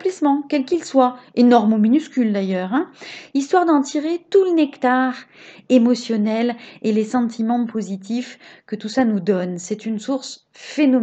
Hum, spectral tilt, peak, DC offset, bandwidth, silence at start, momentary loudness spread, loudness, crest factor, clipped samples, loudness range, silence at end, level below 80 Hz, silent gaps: none; -6 dB/octave; 0 dBFS; under 0.1%; 8.4 kHz; 0 s; 11 LU; -19 LUFS; 18 dB; under 0.1%; 5 LU; 0 s; -70 dBFS; none